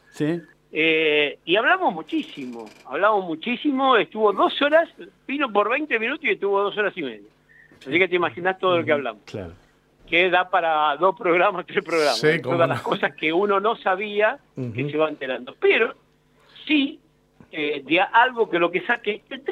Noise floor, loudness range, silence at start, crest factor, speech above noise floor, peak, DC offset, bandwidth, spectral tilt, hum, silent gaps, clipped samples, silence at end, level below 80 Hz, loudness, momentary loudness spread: -58 dBFS; 3 LU; 0.15 s; 18 dB; 37 dB; -4 dBFS; under 0.1%; 13.5 kHz; -5 dB/octave; none; none; under 0.1%; 0 s; -66 dBFS; -21 LUFS; 13 LU